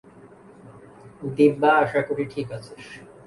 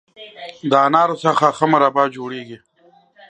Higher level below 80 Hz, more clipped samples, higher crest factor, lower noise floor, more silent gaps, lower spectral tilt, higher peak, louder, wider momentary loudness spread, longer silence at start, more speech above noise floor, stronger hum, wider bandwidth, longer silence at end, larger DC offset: first, -62 dBFS vs -68 dBFS; neither; about the same, 20 dB vs 18 dB; second, -48 dBFS vs -54 dBFS; neither; first, -7 dB/octave vs -5.5 dB/octave; second, -4 dBFS vs 0 dBFS; second, -21 LUFS vs -16 LUFS; about the same, 22 LU vs 20 LU; about the same, 0.25 s vs 0.2 s; second, 26 dB vs 37 dB; neither; first, 11.5 kHz vs 9.8 kHz; second, 0.25 s vs 0.75 s; neither